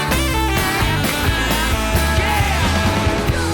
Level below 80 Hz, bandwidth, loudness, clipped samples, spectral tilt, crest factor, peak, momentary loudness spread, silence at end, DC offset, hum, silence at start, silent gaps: -24 dBFS; 19.5 kHz; -17 LUFS; under 0.1%; -4.5 dB/octave; 12 dB; -6 dBFS; 1 LU; 0 s; under 0.1%; none; 0 s; none